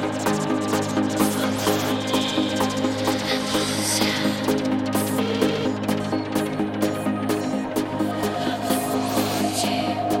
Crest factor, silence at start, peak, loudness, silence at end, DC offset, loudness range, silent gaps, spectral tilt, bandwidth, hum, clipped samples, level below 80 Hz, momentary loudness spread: 16 dB; 0 s; -6 dBFS; -23 LUFS; 0 s; under 0.1%; 2 LU; none; -4 dB/octave; 17 kHz; none; under 0.1%; -54 dBFS; 3 LU